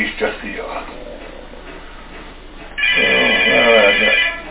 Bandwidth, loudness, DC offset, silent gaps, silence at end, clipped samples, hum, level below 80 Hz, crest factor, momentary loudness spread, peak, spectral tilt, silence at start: 4 kHz; -12 LUFS; under 0.1%; none; 0 s; under 0.1%; none; -38 dBFS; 16 dB; 25 LU; 0 dBFS; -6 dB/octave; 0 s